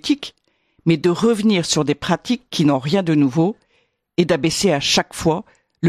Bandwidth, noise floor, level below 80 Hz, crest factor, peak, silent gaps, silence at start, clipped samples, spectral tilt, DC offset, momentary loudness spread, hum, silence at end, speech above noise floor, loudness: 14.5 kHz; -64 dBFS; -50 dBFS; 16 dB; -2 dBFS; none; 0.05 s; under 0.1%; -5 dB/octave; under 0.1%; 7 LU; none; 0 s; 46 dB; -18 LUFS